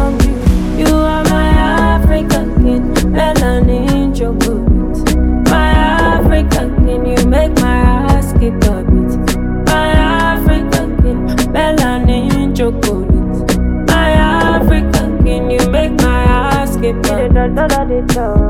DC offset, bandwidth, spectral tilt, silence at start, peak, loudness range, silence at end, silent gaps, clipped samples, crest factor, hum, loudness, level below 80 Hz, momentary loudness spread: under 0.1%; 16.5 kHz; -6 dB/octave; 0 s; 0 dBFS; 1 LU; 0 s; none; under 0.1%; 10 dB; none; -12 LUFS; -14 dBFS; 4 LU